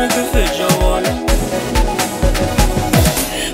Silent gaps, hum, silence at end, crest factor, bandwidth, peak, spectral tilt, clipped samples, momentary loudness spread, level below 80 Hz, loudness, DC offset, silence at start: none; none; 0 s; 14 dB; 16.5 kHz; -2 dBFS; -4.5 dB/octave; under 0.1%; 4 LU; -20 dBFS; -15 LUFS; under 0.1%; 0 s